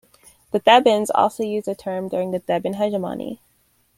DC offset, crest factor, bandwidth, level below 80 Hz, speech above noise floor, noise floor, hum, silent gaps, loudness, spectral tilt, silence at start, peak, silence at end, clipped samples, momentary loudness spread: under 0.1%; 20 dB; 16.5 kHz; -62 dBFS; 43 dB; -62 dBFS; none; none; -20 LUFS; -4.5 dB/octave; 0.55 s; -2 dBFS; 0.65 s; under 0.1%; 14 LU